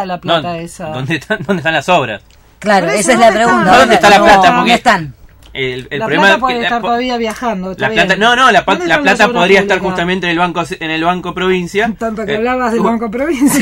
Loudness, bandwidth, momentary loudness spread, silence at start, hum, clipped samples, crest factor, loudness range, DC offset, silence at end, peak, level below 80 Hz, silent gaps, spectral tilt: -11 LUFS; 16.5 kHz; 12 LU; 0 s; none; 0.3%; 12 dB; 6 LU; under 0.1%; 0 s; 0 dBFS; -40 dBFS; none; -4 dB/octave